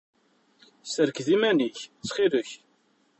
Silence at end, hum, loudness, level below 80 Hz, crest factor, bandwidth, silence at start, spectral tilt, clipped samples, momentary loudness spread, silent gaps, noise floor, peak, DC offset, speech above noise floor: 0.65 s; none; -26 LUFS; -74 dBFS; 18 dB; 8.4 kHz; 0.85 s; -4 dB/octave; under 0.1%; 18 LU; none; -67 dBFS; -10 dBFS; under 0.1%; 41 dB